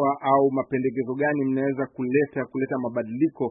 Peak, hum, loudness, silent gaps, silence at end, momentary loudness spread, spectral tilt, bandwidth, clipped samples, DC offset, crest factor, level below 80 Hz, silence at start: -6 dBFS; none; -25 LUFS; none; 0 s; 7 LU; -12 dB/octave; 3.9 kHz; under 0.1%; under 0.1%; 18 dB; -68 dBFS; 0 s